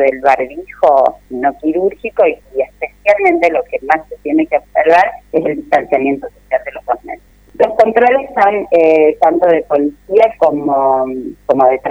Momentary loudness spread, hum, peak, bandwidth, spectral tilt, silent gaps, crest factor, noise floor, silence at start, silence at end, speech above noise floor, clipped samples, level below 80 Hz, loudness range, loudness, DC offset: 10 LU; 50 Hz at -50 dBFS; 0 dBFS; 8.4 kHz; -6.5 dB/octave; none; 12 dB; -31 dBFS; 0 s; 0 s; 19 dB; 0.1%; -46 dBFS; 3 LU; -13 LUFS; under 0.1%